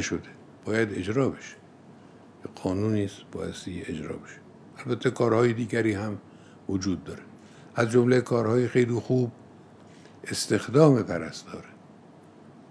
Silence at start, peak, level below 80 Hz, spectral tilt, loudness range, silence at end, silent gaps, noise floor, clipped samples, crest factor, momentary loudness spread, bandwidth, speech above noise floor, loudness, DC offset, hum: 0 s; -6 dBFS; -64 dBFS; -6 dB/octave; 7 LU; 0.95 s; none; -51 dBFS; under 0.1%; 22 dB; 20 LU; 11 kHz; 25 dB; -26 LUFS; under 0.1%; none